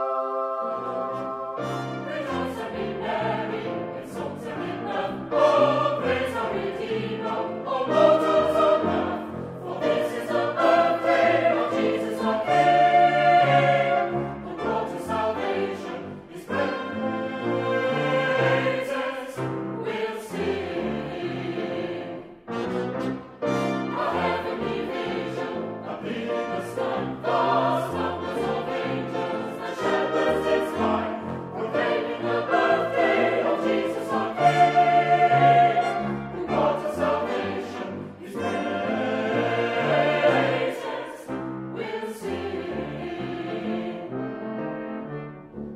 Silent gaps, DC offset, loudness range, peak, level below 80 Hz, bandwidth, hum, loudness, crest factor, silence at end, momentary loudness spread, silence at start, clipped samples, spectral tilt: none; under 0.1%; 9 LU; -6 dBFS; -58 dBFS; 14.5 kHz; none; -25 LUFS; 18 dB; 0 s; 13 LU; 0 s; under 0.1%; -6 dB/octave